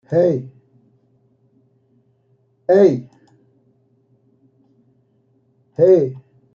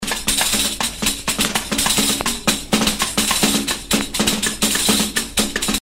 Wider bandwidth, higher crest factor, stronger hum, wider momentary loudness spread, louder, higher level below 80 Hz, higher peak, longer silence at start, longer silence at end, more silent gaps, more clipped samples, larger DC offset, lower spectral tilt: second, 6.8 kHz vs 16.5 kHz; about the same, 18 dB vs 18 dB; neither; first, 21 LU vs 4 LU; about the same, -16 LUFS vs -17 LUFS; second, -66 dBFS vs -36 dBFS; about the same, -2 dBFS vs 0 dBFS; about the same, 0.1 s vs 0 s; first, 0.35 s vs 0 s; neither; neither; neither; first, -9 dB/octave vs -1.5 dB/octave